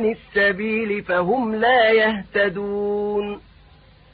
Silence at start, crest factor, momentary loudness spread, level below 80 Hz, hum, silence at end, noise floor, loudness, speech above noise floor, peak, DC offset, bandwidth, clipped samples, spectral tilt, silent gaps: 0 s; 14 dB; 9 LU; -52 dBFS; none; 0.75 s; -50 dBFS; -20 LUFS; 30 dB; -6 dBFS; under 0.1%; 5 kHz; under 0.1%; -10 dB/octave; none